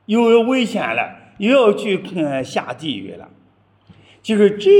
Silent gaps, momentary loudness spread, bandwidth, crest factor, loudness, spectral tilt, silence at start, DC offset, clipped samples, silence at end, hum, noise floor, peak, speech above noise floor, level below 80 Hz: none; 14 LU; 11.5 kHz; 16 dB; -18 LUFS; -5.5 dB/octave; 0.1 s; under 0.1%; under 0.1%; 0 s; none; -55 dBFS; -2 dBFS; 39 dB; -66 dBFS